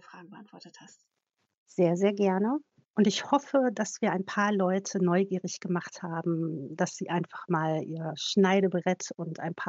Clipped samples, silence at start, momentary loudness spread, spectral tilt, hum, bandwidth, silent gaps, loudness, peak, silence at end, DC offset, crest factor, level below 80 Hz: under 0.1%; 0.15 s; 11 LU; -5.5 dB/octave; none; 8 kHz; 1.57-1.66 s, 2.90-2.94 s; -29 LUFS; -10 dBFS; 0 s; under 0.1%; 18 dB; -86 dBFS